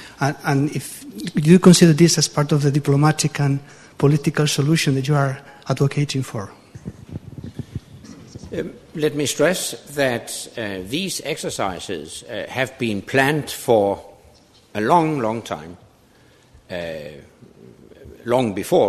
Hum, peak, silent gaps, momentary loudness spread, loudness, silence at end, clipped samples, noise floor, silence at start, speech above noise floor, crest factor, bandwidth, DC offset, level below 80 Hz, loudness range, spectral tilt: none; 0 dBFS; none; 19 LU; -19 LUFS; 0 s; under 0.1%; -52 dBFS; 0 s; 33 dB; 20 dB; 13.5 kHz; under 0.1%; -52 dBFS; 11 LU; -5 dB/octave